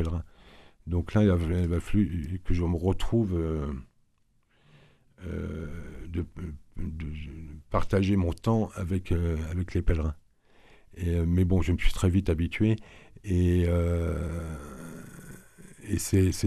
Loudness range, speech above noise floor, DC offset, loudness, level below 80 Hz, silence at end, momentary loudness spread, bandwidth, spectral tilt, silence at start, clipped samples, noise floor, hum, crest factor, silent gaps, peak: 10 LU; 41 dB; under 0.1%; -29 LUFS; -36 dBFS; 0 s; 18 LU; 13.5 kHz; -7 dB/octave; 0 s; under 0.1%; -67 dBFS; none; 18 dB; none; -10 dBFS